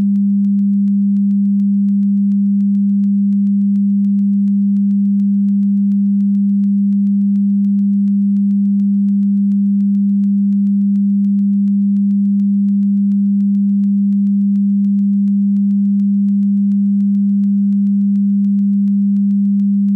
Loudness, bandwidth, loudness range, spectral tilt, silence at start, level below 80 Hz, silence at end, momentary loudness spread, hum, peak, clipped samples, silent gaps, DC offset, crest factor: -14 LUFS; 0.3 kHz; 0 LU; -12.5 dB/octave; 0 s; -70 dBFS; 0 s; 0 LU; none; -10 dBFS; under 0.1%; none; under 0.1%; 4 dB